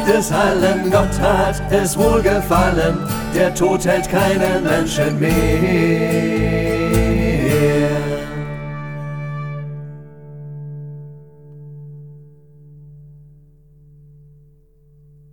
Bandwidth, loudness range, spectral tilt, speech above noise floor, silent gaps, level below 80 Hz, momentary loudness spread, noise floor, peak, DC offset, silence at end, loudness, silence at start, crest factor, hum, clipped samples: over 20 kHz; 19 LU; -5.5 dB/octave; 35 dB; none; -30 dBFS; 19 LU; -50 dBFS; 0 dBFS; under 0.1%; 2.15 s; -17 LUFS; 0 s; 18 dB; none; under 0.1%